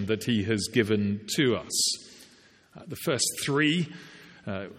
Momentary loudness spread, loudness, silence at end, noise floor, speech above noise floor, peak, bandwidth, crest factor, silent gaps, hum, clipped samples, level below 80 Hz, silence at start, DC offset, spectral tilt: 14 LU; -27 LUFS; 0 s; -57 dBFS; 30 dB; -8 dBFS; 16 kHz; 20 dB; none; none; under 0.1%; -66 dBFS; 0 s; under 0.1%; -3.5 dB/octave